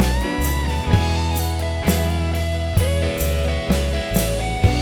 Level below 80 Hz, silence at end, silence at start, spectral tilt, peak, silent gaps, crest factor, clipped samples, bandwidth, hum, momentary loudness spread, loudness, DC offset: -24 dBFS; 0 s; 0 s; -5.5 dB/octave; -2 dBFS; none; 16 dB; under 0.1%; over 20 kHz; none; 3 LU; -21 LUFS; under 0.1%